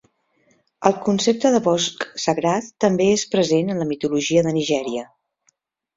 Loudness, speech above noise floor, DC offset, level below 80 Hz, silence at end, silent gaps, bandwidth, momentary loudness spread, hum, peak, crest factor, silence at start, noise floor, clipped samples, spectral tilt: -20 LUFS; 47 dB; under 0.1%; -60 dBFS; 0.9 s; none; 7.8 kHz; 6 LU; none; 0 dBFS; 20 dB; 0.8 s; -66 dBFS; under 0.1%; -4.5 dB/octave